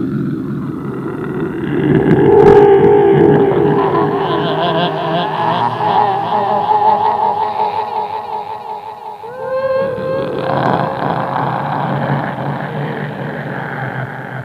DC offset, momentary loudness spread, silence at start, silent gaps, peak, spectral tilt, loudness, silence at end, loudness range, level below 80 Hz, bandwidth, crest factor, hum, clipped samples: under 0.1%; 14 LU; 0 s; none; 0 dBFS; -8.5 dB/octave; -14 LUFS; 0 s; 9 LU; -44 dBFS; 6 kHz; 14 dB; none; under 0.1%